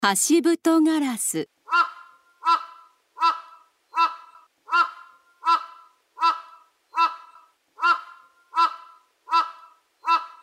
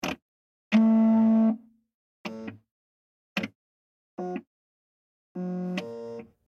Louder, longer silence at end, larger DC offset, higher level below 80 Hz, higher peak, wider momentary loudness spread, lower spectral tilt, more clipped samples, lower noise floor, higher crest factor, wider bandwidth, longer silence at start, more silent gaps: first, -23 LUFS vs -26 LUFS; about the same, 0.15 s vs 0.25 s; neither; second, -86 dBFS vs -72 dBFS; first, -6 dBFS vs -10 dBFS; second, 13 LU vs 21 LU; second, -2 dB/octave vs -7 dB/octave; neither; second, -55 dBFS vs under -90 dBFS; about the same, 20 dB vs 18 dB; first, 16 kHz vs 7.2 kHz; about the same, 0 s vs 0.05 s; second, none vs 0.22-0.71 s, 1.95-2.24 s, 2.71-3.36 s, 3.55-4.17 s, 4.47-5.35 s